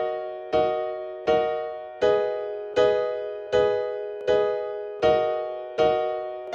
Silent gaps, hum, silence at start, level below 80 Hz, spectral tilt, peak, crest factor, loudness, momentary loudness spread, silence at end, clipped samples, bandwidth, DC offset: none; none; 0 s; -56 dBFS; -5.5 dB/octave; -8 dBFS; 16 dB; -25 LUFS; 9 LU; 0 s; under 0.1%; 7.4 kHz; under 0.1%